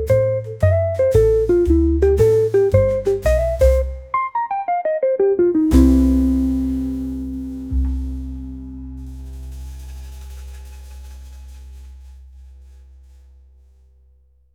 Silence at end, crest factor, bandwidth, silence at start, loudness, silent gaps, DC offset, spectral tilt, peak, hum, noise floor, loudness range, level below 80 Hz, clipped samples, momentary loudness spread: 1.9 s; 18 dB; 15.5 kHz; 0 s; -17 LUFS; none; under 0.1%; -8.5 dB/octave; -2 dBFS; none; -54 dBFS; 21 LU; -26 dBFS; under 0.1%; 22 LU